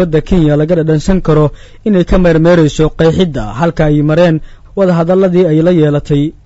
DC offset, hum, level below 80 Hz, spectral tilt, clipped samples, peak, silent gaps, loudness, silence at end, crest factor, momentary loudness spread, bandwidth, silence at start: under 0.1%; none; -24 dBFS; -8 dB/octave; under 0.1%; 0 dBFS; none; -10 LUFS; 0.15 s; 8 dB; 6 LU; 8 kHz; 0 s